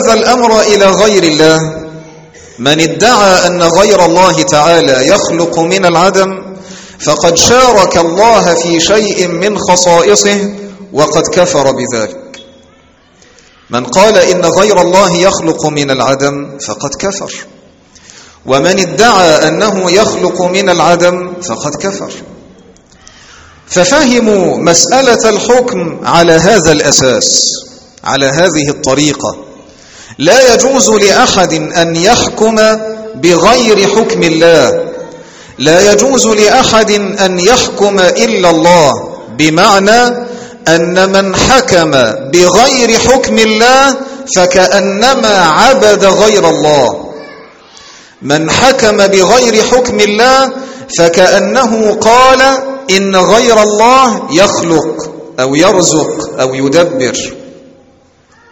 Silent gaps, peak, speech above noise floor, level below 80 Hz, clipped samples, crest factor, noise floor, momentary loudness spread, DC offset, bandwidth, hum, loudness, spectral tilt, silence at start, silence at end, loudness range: none; 0 dBFS; 38 dB; -38 dBFS; 2%; 8 dB; -45 dBFS; 12 LU; under 0.1%; over 20 kHz; none; -7 LUFS; -3 dB/octave; 0 s; 1 s; 5 LU